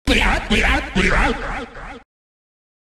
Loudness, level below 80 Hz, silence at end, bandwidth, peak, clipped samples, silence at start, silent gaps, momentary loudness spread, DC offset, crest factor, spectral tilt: -18 LUFS; -26 dBFS; 0.85 s; 13.5 kHz; -4 dBFS; under 0.1%; 0.05 s; none; 17 LU; under 0.1%; 16 dB; -4.5 dB/octave